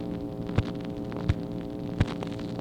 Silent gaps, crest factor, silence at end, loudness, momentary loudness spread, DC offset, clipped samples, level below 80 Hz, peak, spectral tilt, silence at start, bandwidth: none; 22 dB; 0 s; -32 LUFS; 5 LU; under 0.1%; under 0.1%; -42 dBFS; -8 dBFS; -8 dB/octave; 0 s; 11.5 kHz